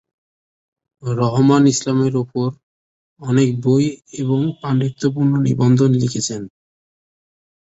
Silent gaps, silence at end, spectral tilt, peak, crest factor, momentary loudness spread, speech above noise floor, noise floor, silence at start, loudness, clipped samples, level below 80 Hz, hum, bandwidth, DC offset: 2.63-3.16 s; 1.15 s; -6.5 dB/octave; -2 dBFS; 16 dB; 11 LU; over 74 dB; under -90 dBFS; 1.05 s; -17 LUFS; under 0.1%; -54 dBFS; none; 8.2 kHz; under 0.1%